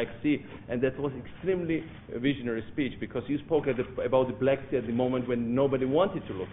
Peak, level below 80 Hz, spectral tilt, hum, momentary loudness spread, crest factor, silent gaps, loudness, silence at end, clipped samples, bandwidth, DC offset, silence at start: -10 dBFS; -54 dBFS; -5 dB/octave; none; 8 LU; 18 dB; none; -29 LUFS; 0 s; under 0.1%; 3.9 kHz; under 0.1%; 0 s